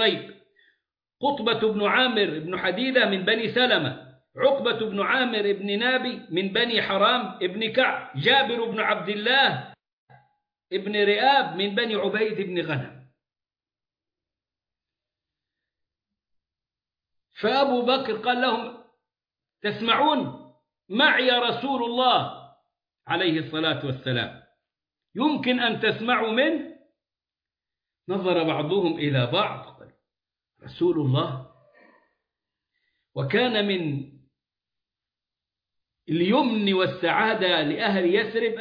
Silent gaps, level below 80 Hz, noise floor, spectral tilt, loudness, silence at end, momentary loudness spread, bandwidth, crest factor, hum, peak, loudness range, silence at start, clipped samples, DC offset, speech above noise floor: 9.93-10.07 s; -70 dBFS; under -90 dBFS; -7.5 dB/octave; -23 LUFS; 0 s; 11 LU; 5.2 kHz; 18 dB; none; -8 dBFS; 6 LU; 0 s; under 0.1%; under 0.1%; over 67 dB